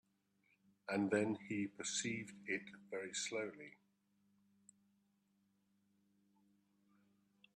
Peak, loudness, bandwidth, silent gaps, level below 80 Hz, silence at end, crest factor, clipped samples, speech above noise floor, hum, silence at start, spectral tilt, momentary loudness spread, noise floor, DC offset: -22 dBFS; -42 LUFS; 13 kHz; none; -86 dBFS; 3.85 s; 24 dB; under 0.1%; 37 dB; 50 Hz at -70 dBFS; 0.9 s; -3.5 dB/octave; 12 LU; -80 dBFS; under 0.1%